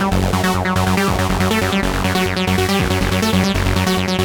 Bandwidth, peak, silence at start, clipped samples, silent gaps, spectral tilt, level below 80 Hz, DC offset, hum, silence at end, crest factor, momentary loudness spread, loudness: 19.5 kHz; -4 dBFS; 0 s; under 0.1%; none; -5 dB/octave; -28 dBFS; under 0.1%; none; 0 s; 12 dB; 1 LU; -17 LUFS